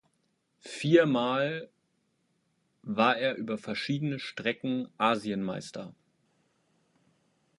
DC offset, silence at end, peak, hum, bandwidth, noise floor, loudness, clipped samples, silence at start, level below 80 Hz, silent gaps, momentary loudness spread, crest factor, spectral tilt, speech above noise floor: under 0.1%; 1.65 s; -8 dBFS; none; 11.5 kHz; -75 dBFS; -29 LUFS; under 0.1%; 0.65 s; -74 dBFS; none; 17 LU; 24 dB; -6 dB/octave; 46 dB